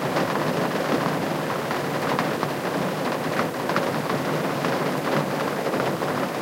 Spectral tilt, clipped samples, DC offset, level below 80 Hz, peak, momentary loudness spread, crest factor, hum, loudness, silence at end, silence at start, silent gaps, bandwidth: -5 dB/octave; under 0.1%; under 0.1%; -62 dBFS; -6 dBFS; 2 LU; 20 dB; none; -25 LUFS; 0 s; 0 s; none; 16 kHz